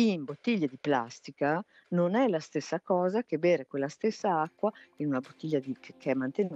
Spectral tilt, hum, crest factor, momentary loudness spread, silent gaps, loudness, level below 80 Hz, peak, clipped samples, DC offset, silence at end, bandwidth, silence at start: -6.5 dB/octave; none; 16 dB; 7 LU; none; -31 LUFS; -82 dBFS; -14 dBFS; under 0.1%; under 0.1%; 0 s; 8.2 kHz; 0 s